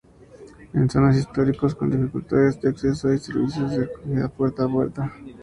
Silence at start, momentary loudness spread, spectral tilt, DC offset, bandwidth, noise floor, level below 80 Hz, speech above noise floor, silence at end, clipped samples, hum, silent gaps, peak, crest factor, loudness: 0.4 s; 7 LU; -8.5 dB/octave; under 0.1%; 11 kHz; -46 dBFS; -46 dBFS; 24 dB; 0 s; under 0.1%; none; none; -4 dBFS; 18 dB; -23 LUFS